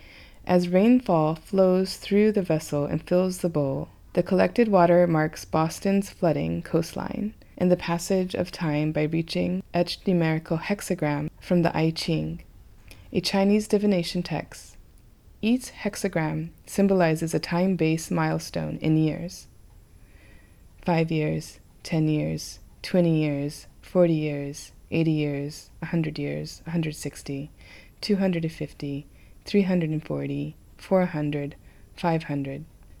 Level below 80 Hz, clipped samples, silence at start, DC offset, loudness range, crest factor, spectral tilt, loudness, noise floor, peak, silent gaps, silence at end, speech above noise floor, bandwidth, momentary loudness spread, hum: -50 dBFS; under 0.1%; 0.05 s; under 0.1%; 6 LU; 20 dB; -6.5 dB/octave; -25 LUFS; -52 dBFS; -6 dBFS; none; 0.35 s; 27 dB; 14.5 kHz; 13 LU; none